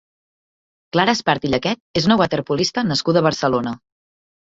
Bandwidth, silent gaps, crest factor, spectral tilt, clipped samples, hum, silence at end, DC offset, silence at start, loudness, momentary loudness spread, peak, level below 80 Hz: 7.8 kHz; 1.80-1.94 s; 18 dB; -5 dB/octave; under 0.1%; none; 0.75 s; under 0.1%; 0.95 s; -19 LUFS; 6 LU; -2 dBFS; -50 dBFS